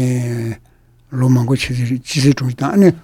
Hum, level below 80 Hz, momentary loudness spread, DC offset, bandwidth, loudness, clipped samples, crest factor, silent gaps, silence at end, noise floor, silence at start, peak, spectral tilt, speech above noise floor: none; -44 dBFS; 13 LU; under 0.1%; 15 kHz; -16 LUFS; under 0.1%; 16 dB; none; 0.05 s; -50 dBFS; 0 s; 0 dBFS; -6.5 dB/octave; 36 dB